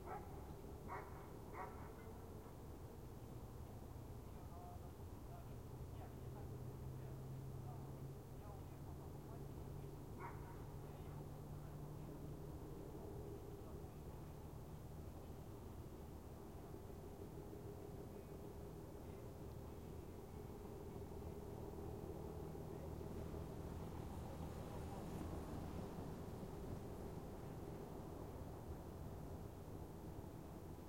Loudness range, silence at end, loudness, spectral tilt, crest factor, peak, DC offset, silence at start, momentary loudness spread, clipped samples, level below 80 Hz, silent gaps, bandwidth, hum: 4 LU; 0 s; -54 LUFS; -7 dB/octave; 16 dB; -36 dBFS; under 0.1%; 0 s; 5 LU; under 0.1%; -60 dBFS; none; 16.5 kHz; none